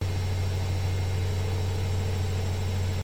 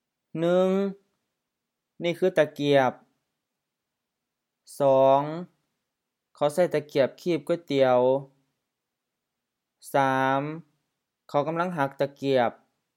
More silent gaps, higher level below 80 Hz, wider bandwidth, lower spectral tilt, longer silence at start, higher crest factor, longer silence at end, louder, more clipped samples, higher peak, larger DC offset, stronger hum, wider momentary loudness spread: neither; first, -42 dBFS vs -82 dBFS; about the same, 16 kHz vs 16 kHz; about the same, -6 dB/octave vs -6.5 dB/octave; second, 0 s vs 0.35 s; second, 10 dB vs 20 dB; second, 0 s vs 0.45 s; second, -29 LUFS vs -25 LUFS; neither; second, -18 dBFS vs -8 dBFS; neither; first, 50 Hz at -50 dBFS vs none; second, 1 LU vs 10 LU